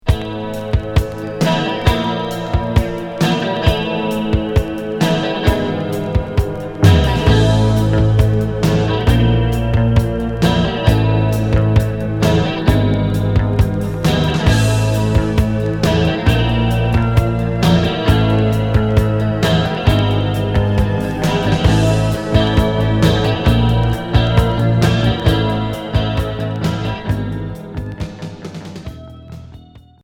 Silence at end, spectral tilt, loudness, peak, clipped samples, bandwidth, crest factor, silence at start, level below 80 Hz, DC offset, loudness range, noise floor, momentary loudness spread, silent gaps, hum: 0.25 s; -7 dB/octave; -16 LUFS; 0 dBFS; under 0.1%; 17 kHz; 14 dB; 0.05 s; -24 dBFS; under 0.1%; 4 LU; -40 dBFS; 8 LU; none; none